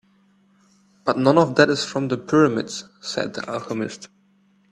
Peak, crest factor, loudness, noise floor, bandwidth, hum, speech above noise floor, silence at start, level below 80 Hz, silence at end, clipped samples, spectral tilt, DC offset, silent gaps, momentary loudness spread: 0 dBFS; 22 dB; -21 LUFS; -60 dBFS; 11 kHz; none; 39 dB; 1.05 s; -62 dBFS; 0.65 s; under 0.1%; -5 dB/octave; under 0.1%; none; 14 LU